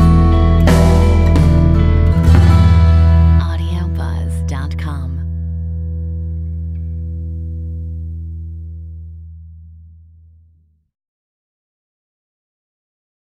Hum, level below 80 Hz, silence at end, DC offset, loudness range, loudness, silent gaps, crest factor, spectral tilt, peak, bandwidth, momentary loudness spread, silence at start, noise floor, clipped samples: none; -22 dBFS; 3.7 s; under 0.1%; 20 LU; -14 LUFS; none; 14 dB; -8 dB/octave; 0 dBFS; 10 kHz; 18 LU; 0 s; -54 dBFS; under 0.1%